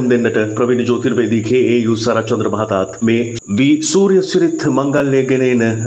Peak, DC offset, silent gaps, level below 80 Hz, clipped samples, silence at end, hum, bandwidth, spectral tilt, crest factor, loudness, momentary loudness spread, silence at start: -2 dBFS; under 0.1%; none; -54 dBFS; under 0.1%; 0 s; none; 9 kHz; -5.5 dB/octave; 12 dB; -15 LUFS; 4 LU; 0 s